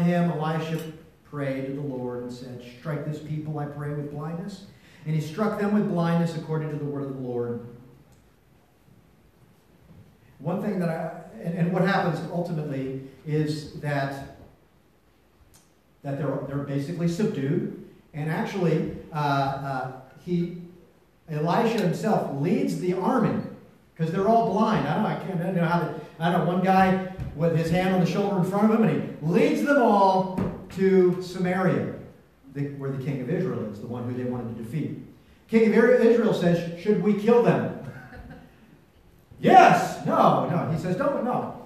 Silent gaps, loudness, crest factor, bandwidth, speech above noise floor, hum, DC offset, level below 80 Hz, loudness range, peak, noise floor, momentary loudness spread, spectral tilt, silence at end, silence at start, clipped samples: none; -25 LUFS; 22 dB; 14 kHz; 37 dB; none; under 0.1%; -56 dBFS; 11 LU; -2 dBFS; -61 dBFS; 15 LU; -7.5 dB/octave; 0 s; 0 s; under 0.1%